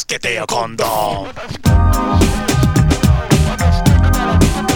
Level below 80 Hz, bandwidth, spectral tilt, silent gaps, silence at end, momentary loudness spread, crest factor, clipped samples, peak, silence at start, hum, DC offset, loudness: -20 dBFS; 19.5 kHz; -5.5 dB/octave; none; 0 s; 6 LU; 14 dB; under 0.1%; 0 dBFS; 0 s; none; under 0.1%; -14 LUFS